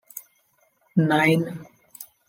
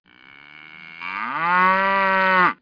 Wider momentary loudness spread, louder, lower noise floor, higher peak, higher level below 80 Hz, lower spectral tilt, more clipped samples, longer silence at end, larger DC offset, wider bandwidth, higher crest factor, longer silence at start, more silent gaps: first, 23 LU vs 18 LU; second, -22 LUFS vs -18 LUFS; first, -65 dBFS vs -47 dBFS; about the same, -6 dBFS vs -4 dBFS; second, -72 dBFS vs -62 dBFS; about the same, -6.5 dB/octave vs -6 dB/octave; neither; first, 0.25 s vs 0.1 s; neither; first, 17 kHz vs 5.2 kHz; about the same, 20 dB vs 18 dB; second, 0.15 s vs 0.55 s; neither